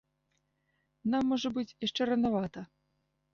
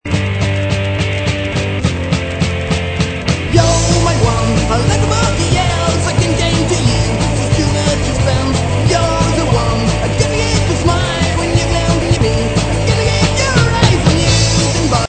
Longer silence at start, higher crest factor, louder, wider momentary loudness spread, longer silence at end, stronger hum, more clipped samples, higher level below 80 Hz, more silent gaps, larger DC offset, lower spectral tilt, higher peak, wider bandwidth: first, 1.05 s vs 0.05 s; about the same, 14 dB vs 12 dB; second, -32 LUFS vs -14 LUFS; first, 12 LU vs 5 LU; first, 0.7 s vs 0 s; neither; neither; second, -66 dBFS vs -22 dBFS; neither; neither; about the same, -5.5 dB/octave vs -5 dB/octave; second, -20 dBFS vs 0 dBFS; second, 7.2 kHz vs 9.2 kHz